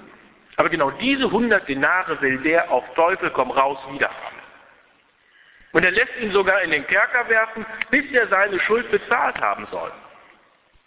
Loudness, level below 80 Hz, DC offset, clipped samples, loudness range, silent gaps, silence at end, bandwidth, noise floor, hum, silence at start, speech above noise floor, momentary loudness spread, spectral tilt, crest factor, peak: -20 LUFS; -56 dBFS; under 0.1%; under 0.1%; 4 LU; none; 0.85 s; 4 kHz; -58 dBFS; none; 0 s; 38 dB; 7 LU; -7.5 dB/octave; 20 dB; -2 dBFS